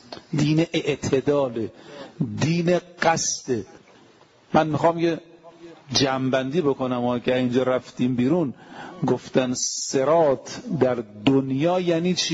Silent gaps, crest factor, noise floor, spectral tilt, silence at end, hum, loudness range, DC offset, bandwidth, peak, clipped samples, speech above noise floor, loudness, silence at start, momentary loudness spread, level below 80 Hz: none; 18 dB; -54 dBFS; -5 dB/octave; 0 s; none; 2 LU; under 0.1%; 11 kHz; -4 dBFS; under 0.1%; 31 dB; -23 LUFS; 0.1 s; 9 LU; -58 dBFS